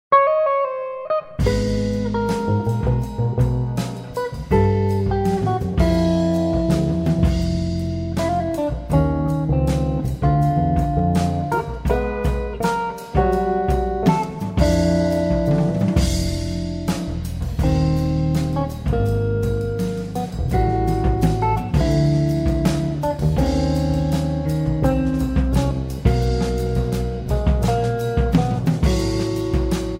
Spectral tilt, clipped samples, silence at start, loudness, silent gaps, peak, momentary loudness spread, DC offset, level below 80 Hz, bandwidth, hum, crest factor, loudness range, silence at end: -7.5 dB/octave; under 0.1%; 0.1 s; -20 LUFS; none; -2 dBFS; 6 LU; under 0.1%; -26 dBFS; 16 kHz; none; 16 dB; 2 LU; 0 s